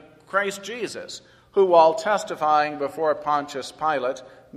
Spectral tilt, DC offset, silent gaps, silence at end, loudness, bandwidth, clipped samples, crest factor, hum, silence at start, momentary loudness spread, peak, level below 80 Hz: -4 dB/octave; under 0.1%; none; 0 s; -23 LUFS; 14 kHz; under 0.1%; 20 dB; none; 0.35 s; 16 LU; -2 dBFS; -66 dBFS